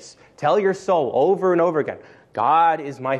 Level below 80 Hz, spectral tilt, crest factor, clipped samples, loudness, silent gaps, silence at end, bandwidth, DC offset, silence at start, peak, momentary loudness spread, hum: -68 dBFS; -6.5 dB/octave; 14 dB; under 0.1%; -20 LUFS; none; 0 s; 9.4 kHz; under 0.1%; 0 s; -6 dBFS; 10 LU; none